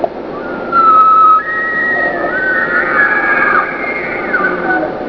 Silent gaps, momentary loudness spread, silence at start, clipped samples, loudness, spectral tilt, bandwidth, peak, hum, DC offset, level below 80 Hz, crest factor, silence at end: none; 11 LU; 0 s; under 0.1%; -11 LUFS; -7 dB/octave; 5.4 kHz; 0 dBFS; none; 0.1%; -44 dBFS; 12 dB; 0 s